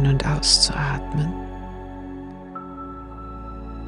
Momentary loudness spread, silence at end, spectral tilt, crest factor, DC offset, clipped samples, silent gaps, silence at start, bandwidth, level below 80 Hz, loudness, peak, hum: 20 LU; 0 s; -3.5 dB/octave; 22 dB; under 0.1%; under 0.1%; none; 0 s; 11.5 kHz; -34 dBFS; -20 LUFS; -2 dBFS; none